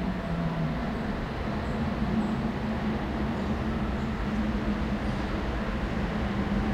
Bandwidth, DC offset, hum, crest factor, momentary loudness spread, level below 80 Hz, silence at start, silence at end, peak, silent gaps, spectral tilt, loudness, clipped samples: 10.5 kHz; under 0.1%; none; 14 dB; 3 LU; -36 dBFS; 0 s; 0 s; -16 dBFS; none; -7.5 dB/octave; -30 LUFS; under 0.1%